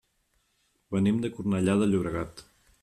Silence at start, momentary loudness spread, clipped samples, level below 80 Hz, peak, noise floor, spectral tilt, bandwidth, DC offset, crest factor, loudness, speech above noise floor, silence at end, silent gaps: 0.9 s; 10 LU; under 0.1%; -56 dBFS; -12 dBFS; -72 dBFS; -7 dB/octave; 11.5 kHz; under 0.1%; 16 dB; -27 LUFS; 46 dB; 0.4 s; none